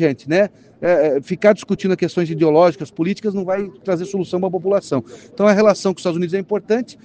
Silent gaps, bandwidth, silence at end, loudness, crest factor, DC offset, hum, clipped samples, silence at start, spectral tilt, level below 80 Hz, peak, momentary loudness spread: none; 9.4 kHz; 0.1 s; -18 LUFS; 18 dB; under 0.1%; none; under 0.1%; 0 s; -6.5 dB/octave; -60 dBFS; 0 dBFS; 9 LU